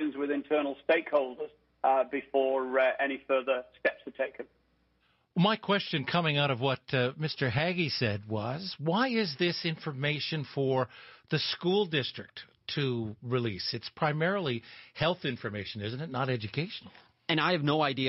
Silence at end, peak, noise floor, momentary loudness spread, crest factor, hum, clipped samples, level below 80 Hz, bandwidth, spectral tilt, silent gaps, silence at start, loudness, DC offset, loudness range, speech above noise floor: 0 s; -14 dBFS; -71 dBFS; 10 LU; 18 dB; none; under 0.1%; -66 dBFS; 6 kHz; -8.5 dB/octave; none; 0 s; -30 LUFS; under 0.1%; 3 LU; 41 dB